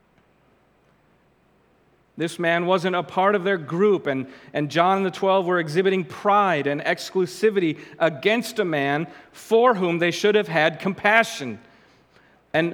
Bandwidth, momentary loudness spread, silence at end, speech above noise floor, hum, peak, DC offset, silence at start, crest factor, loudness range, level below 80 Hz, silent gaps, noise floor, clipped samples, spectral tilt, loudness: 18 kHz; 9 LU; 0 s; 39 dB; none; -2 dBFS; under 0.1%; 2.15 s; 22 dB; 3 LU; -70 dBFS; none; -61 dBFS; under 0.1%; -5.5 dB/octave; -21 LUFS